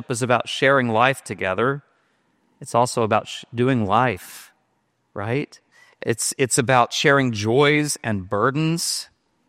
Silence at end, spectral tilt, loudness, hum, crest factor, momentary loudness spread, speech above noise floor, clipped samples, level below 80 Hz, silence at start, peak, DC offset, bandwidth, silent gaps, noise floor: 0.45 s; -4 dB/octave; -20 LUFS; none; 20 dB; 14 LU; 48 dB; under 0.1%; -62 dBFS; 0 s; -2 dBFS; under 0.1%; 16 kHz; none; -69 dBFS